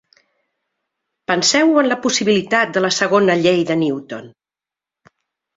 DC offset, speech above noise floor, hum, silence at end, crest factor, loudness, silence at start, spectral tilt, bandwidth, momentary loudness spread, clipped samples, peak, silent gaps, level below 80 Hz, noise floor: under 0.1%; 73 dB; none; 1.3 s; 18 dB; -16 LUFS; 1.3 s; -3.5 dB/octave; 8 kHz; 13 LU; under 0.1%; -2 dBFS; none; -62 dBFS; -89 dBFS